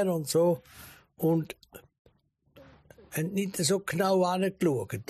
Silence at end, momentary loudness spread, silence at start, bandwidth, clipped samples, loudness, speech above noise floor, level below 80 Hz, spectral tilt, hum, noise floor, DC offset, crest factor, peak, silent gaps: 0.05 s; 15 LU; 0 s; 15 kHz; under 0.1%; -28 LUFS; 38 dB; -66 dBFS; -5 dB/octave; none; -66 dBFS; under 0.1%; 16 dB; -14 dBFS; 1.99-2.05 s